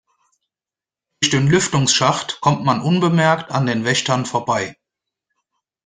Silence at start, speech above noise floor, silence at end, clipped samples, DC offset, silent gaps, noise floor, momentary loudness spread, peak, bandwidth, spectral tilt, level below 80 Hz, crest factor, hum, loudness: 1.2 s; over 73 dB; 1.15 s; under 0.1%; under 0.1%; none; under -90 dBFS; 6 LU; -2 dBFS; 9.8 kHz; -4 dB/octave; -54 dBFS; 18 dB; none; -17 LUFS